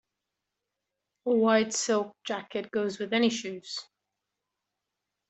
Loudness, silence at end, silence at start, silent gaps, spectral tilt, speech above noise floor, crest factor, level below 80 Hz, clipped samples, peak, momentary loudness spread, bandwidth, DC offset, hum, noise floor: -28 LUFS; 1.45 s; 1.25 s; none; -3.5 dB/octave; 58 dB; 22 dB; -78 dBFS; under 0.1%; -8 dBFS; 14 LU; 8.2 kHz; under 0.1%; none; -86 dBFS